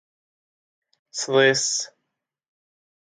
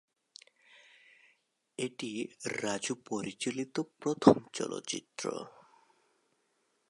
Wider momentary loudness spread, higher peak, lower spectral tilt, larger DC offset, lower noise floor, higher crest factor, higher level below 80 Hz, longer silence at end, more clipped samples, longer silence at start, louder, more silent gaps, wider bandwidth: first, 17 LU vs 14 LU; about the same, -4 dBFS vs -6 dBFS; second, -2 dB/octave vs -4.5 dB/octave; neither; first, -81 dBFS vs -76 dBFS; second, 22 dB vs 30 dB; about the same, -78 dBFS vs -74 dBFS; second, 1.2 s vs 1.4 s; neither; second, 1.15 s vs 1.8 s; first, -20 LUFS vs -33 LUFS; neither; second, 9.6 kHz vs 11.5 kHz